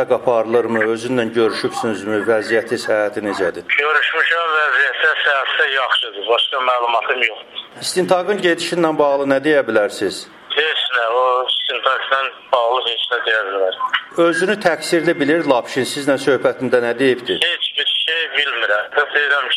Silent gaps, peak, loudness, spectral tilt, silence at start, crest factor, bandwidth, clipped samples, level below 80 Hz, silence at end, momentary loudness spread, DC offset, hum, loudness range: none; 0 dBFS; -17 LUFS; -3.5 dB/octave; 0 s; 18 dB; 14.5 kHz; under 0.1%; -64 dBFS; 0 s; 5 LU; under 0.1%; none; 2 LU